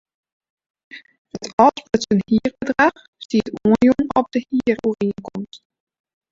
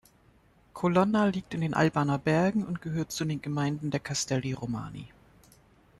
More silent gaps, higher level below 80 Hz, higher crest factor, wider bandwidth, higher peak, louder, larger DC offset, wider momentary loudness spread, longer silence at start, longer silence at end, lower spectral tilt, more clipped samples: first, 1.18-1.25 s, 1.53-1.58 s, 3.08-3.13 s, 3.25-3.29 s vs none; first, -52 dBFS vs -60 dBFS; about the same, 18 dB vs 18 dB; second, 7.6 kHz vs 13 kHz; first, -2 dBFS vs -10 dBFS; first, -19 LUFS vs -29 LUFS; neither; first, 16 LU vs 10 LU; first, 0.95 s vs 0.75 s; second, 0.75 s vs 0.9 s; about the same, -6 dB/octave vs -5.5 dB/octave; neither